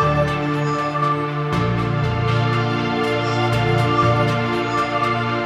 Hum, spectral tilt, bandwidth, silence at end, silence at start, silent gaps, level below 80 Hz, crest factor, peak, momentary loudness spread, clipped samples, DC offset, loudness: none; -6.5 dB/octave; 11.5 kHz; 0 s; 0 s; none; -40 dBFS; 14 dB; -6 dBFS; 4 LU; under 0.1%; under 0.1%; -19 LUFS